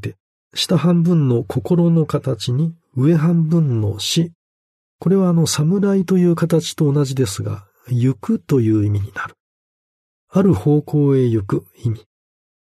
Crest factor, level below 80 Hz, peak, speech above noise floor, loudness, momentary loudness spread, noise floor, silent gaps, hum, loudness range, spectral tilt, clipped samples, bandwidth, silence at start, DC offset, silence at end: 16 dB; -56 dBFS; -2 dBFS; over 74 dB; -17 LUFS; 10 LU; under -90 dBFS; 0.20-0.51 s, 4.35-4.99 s, 9.40-10.28 s; none; 3 LU; -6.5 dB/octave; under 0.1%; 13.5 kHz; 0 s; under 0.1%; 0.65 s